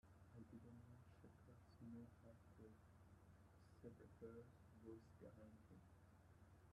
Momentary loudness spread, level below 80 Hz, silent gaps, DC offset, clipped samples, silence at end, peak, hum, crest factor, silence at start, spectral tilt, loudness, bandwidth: 7 LU; -78 dBFS; none; under 0.1%; under 0.1%; 0 s; -46 dBFS; none; 18 dB; 0.05 s; -8 dB/octave; -65 LUFS; 11.5 kHz